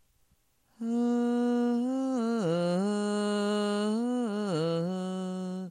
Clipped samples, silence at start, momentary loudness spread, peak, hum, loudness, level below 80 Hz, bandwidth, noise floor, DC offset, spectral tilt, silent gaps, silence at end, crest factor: under 0.1%; 0.8 s; 6 LU; -16 dBFS; none; -30 LUFS; -82 dBFS; 10 kHz; -69 dBFS; under 0.1%; -6.5 dB/octave; none; 0 s; 12 dB